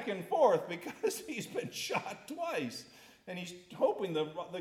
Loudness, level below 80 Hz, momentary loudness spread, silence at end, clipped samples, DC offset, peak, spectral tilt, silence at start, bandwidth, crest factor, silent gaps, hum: -35 LUFS; -80 dBFS; 16 LU; 0 s; under 0.1%; under 0.1%; -14 dBFS; -4 dB/octave; 0 s; 17 kHz; 20 dB; none; none